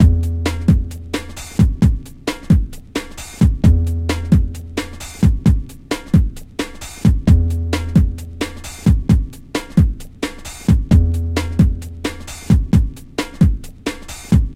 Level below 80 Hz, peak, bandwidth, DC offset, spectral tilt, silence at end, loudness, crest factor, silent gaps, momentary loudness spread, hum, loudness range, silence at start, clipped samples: -20 dBFS; 0 dBFS; 15.5 kHz; under 0.1%; -7 dB/octave; 0 s; -18 LUFS; 16 dB; none; 12 LU; none; 2 LU; 0 s; under 0.1%